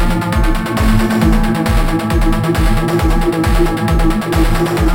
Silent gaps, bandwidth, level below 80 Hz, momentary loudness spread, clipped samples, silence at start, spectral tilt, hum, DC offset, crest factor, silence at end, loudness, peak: none; 17 kHz; -16 dBFS; 2 LU; under 0.1%; 0 s; -6 dB/octave; none; under 0.1%; 12 dB; 0 s; -14 LUFS; 0 dBFS